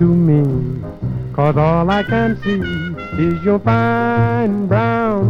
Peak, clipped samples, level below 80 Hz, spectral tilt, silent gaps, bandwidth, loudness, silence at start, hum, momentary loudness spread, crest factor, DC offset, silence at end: 0 dBFS; under 0.1%; -36 dBFS; -9.5 dB/octave; none; 6.6 kHz; -16 LUFS; 0 s; none; 10 LU; 14 dB; under 0.1%; 0 s